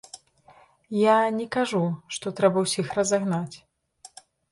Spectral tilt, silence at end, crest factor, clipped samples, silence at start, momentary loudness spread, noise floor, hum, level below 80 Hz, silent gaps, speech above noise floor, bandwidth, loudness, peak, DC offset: -5 dB/octave; 0.95 s; 18 dB; under 0.1%; 0.15 s; 12 LU; -56 dBFS; none; -66 dBFS; none; 32 dB; 11.5 kHz; -24 LUFS; -8 dBFS; under 0.1%